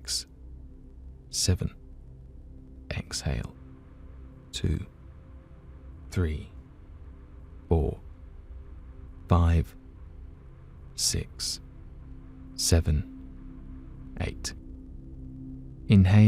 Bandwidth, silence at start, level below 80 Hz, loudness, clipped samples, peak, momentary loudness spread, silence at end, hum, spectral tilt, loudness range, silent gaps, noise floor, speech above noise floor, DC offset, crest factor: 15.5 kHz; 0 s; -40 dBFS; -29 LUFS; under 0.1%; -8 dBFS; 25 LU; 0 s; none; -5 dB/octave; 6 LU; none; -48 dBFS; 24 dB; under 0.1%; 22 dB